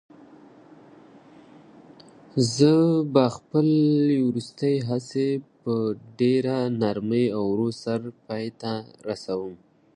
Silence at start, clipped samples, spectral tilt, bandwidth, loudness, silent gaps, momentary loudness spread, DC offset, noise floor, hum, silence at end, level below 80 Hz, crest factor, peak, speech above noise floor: 2.35 s; under 0.1%; -7 dB/octave; 11 kHz; -24 LUFS; none; 12 LU; under 0.1%; -50 dBFS; none; 0.4 s; -66 dBFS; 20 dB; -4 dBFS; 27 dB